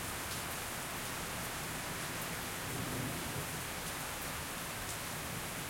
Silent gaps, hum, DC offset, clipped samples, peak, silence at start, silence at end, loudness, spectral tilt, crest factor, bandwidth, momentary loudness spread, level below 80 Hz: none; none; under 0.1%; under 0.1%; -24 dBFS; 0 s; 0 s; -39 LUFS; -2.5 dB/octave; 16 dB; 17 kHz; 1 LU; -56 dBFS